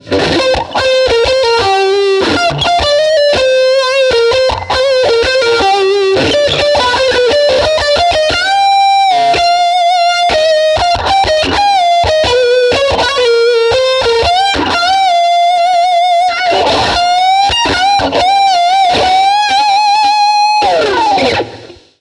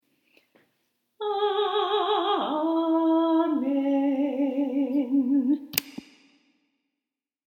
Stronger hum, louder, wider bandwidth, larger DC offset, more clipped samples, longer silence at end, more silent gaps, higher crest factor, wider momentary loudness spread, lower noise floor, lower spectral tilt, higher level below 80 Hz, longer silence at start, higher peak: neither; first, -9 LUFS vs -25 LUFS; second, 12.5 kHz vs 19.5 kHz; neither; neither; second, 0.3 s vs 1.5 s; neither; second, 10 dB vs 26 dB; second, 2 LU vs 6 LU; second, -32 dBFS vs -88 dBFS; about the same, -3 dB/octave vs -3.5 dB/octave; first, -34 dBFS vs -78 dBFS; second, 0.05 s vs 1.2 s; about the same, 0 dBFS vs 0 dBFS